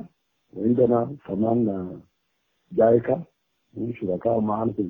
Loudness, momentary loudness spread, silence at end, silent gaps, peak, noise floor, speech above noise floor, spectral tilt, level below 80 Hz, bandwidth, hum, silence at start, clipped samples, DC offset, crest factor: -24 LUFS; 16 LU; 0 s; none; -6 dBFS; -73 dBFS; 51 dB; -12 dB/octave; -60 dBFS; 3.7 kHz; none; 0 s; under 0.1%; under 0.1%; 18 dB